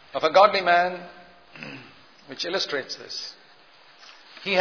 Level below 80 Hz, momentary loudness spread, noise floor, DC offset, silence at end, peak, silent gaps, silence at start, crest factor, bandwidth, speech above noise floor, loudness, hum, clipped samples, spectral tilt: -74 dBFS; 25 LU; -54 dBFS; 0.1%; 0 s; -2 dBFS; none; 0.15 s; 24 dB; 5.4 kHz; 31 dB; -22 LUFS; none; under 0.1%; -3 dB/octave